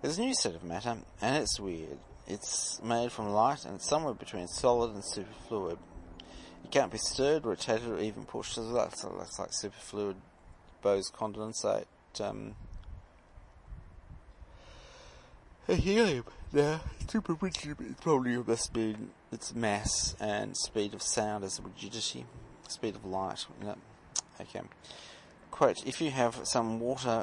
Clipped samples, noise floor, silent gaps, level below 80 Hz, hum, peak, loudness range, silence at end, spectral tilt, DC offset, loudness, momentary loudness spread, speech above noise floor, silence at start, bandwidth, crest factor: under 0.1%; -56 dBFS; none; -54 dBFS; none; -10 dBFS; 7 LU; 0 s; -3.5 dB/octave; under 0.1%; -33 LUFS; 19 LU; 23 dB; 0 s; 11.5 kHz; 24 dB